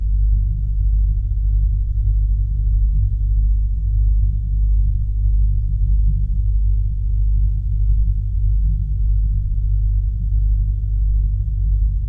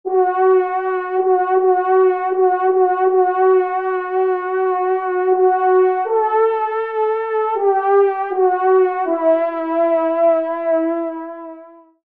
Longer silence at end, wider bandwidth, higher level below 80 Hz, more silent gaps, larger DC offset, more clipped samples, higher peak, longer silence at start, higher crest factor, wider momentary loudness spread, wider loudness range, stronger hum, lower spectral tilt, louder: second, 0 s vs 0.35 s; second, 0.5 kHz vs 3.7 kHz; first, -16 dBFS vs -72 dBFS; neither; first, 0.5% vs 0.2%; neither; about the same, -6 dBFS vs -4 dBFS; about the same, 0 s vs 0.05 s; about the same, 10 dB vs 12 dB; second, 2 LU vs 6 LU; about the same, 1 LU vs 1 LU; first, 50 Hz at -15 dBFS vs none; first, -12 dB/octave vs -7 dB/octave; second, -20 LUFS vs -16 LUFS